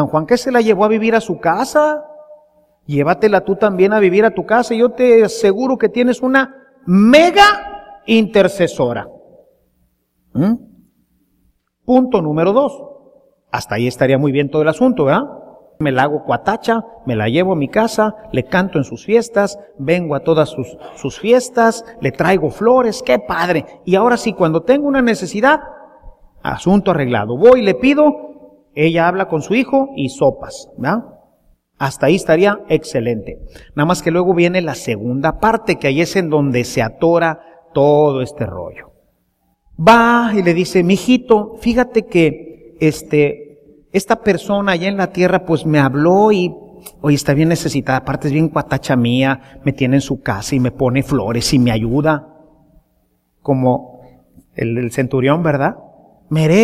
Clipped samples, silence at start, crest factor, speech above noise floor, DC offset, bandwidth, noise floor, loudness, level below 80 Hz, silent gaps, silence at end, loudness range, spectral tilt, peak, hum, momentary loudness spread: under 0.1%; 0 s; 14 dB; 49 dB; under 0.1%; 15 kHz; -63 dBFS; -15 LUFS; -44 dBFS; none; 0 s; 5 LU; -6 dB/octave; 0 dBFS; none; 11 LU